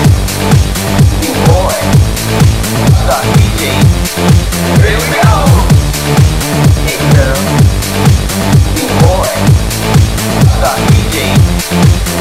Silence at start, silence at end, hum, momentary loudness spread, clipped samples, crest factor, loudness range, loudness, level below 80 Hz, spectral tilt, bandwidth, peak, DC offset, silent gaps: 0 s; 0 s; none; 2 LU; 4%; 8 dB; 1 LU; -9 LUFS; -16 dBFS; -5.5 dB/octave; 16.5 kHz; 0 dBFS; under 0.1%; none